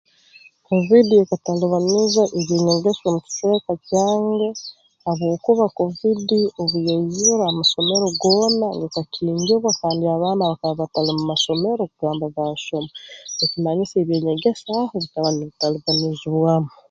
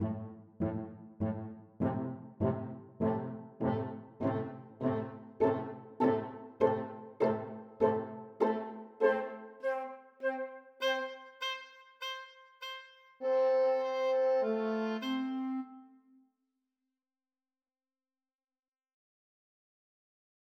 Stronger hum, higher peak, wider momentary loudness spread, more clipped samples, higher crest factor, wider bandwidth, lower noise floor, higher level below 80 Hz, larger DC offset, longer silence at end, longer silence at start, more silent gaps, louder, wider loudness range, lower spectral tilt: neither; first, -2 dBFS vs -14 dBFS; second, 8 LU vs 14 LU; neither; about the same, 18 dB vs 20 dB; second, 7.8 kHz vs 14.5 kHz; second, -50 dBFS vs under -90 dBFS; first, -58 dBFS vs -70 dBFS; neither; second, 0.2 s vs 4.65 s; first, 0.7 s vs 0 s; neither; first, -19 LUFS vs -35 LUFS; about the same, 4 LU vs 6 LU; second, -5 dB/octave vs -7 dB/octave